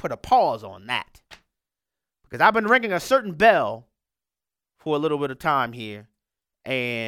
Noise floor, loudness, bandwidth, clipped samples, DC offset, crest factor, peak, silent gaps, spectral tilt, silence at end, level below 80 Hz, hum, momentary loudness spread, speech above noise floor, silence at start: under -90 dBFS; -22 LUFS; 16.5 kHz; under 0.1%; under 0.1%; 20 dB; -4 dBFS; none; -5 dB/octave; 0 s; -58 dBFS; none; 20 LU; over 68 dB; 0.05 s